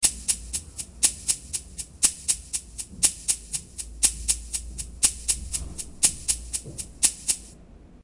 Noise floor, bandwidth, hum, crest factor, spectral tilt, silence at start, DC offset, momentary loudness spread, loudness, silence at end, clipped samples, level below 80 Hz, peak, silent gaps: -48 dBFS; 11.5 kHz; none; 26 dB; 0 dB/octave; 0 s; under 0.1%; 11 LU; -24 LUFS; 0.05 s; under 0.1%; -42 dBFS; -2 dBFS; none